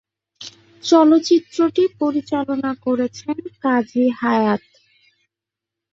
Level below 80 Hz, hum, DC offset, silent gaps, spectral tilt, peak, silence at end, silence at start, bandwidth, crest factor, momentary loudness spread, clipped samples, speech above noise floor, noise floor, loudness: -64 dBFS; none; under 0.1%; none; -5 dB/octave; -2 dBFS; 1.35 s; 0.4 s; 7.6 kHz; 18 dB; 15 LU; under 0.1%; 68 dB; -86 dBFS; -18 LUFS